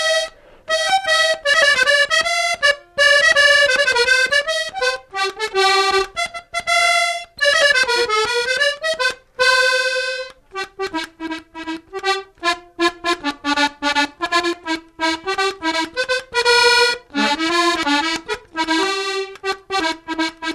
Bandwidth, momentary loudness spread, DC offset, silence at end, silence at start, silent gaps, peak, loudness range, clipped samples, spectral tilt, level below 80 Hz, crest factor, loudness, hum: 14 kHz; 12 LU; under 0.1%; 0 s; 0 s; none; -2 dBFS; 7 LU; under 0.1%; -0.5 dB/octave; -52 dBFS; 16 dB; -17 LUFS; none